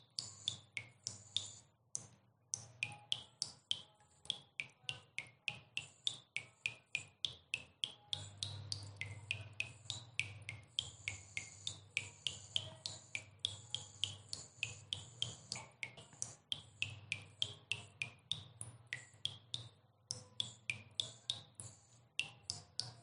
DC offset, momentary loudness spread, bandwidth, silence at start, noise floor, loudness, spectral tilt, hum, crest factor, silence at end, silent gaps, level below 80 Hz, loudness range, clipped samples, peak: under 0.1%; 7 LU; 11 kHz; 0 s; -66 dBFS; -44 LUFS; -0.5 dB/octave; none; 30 dB; 0 s; none; -80 dBFS; 1 LU; under 0.1%; -18 dBFS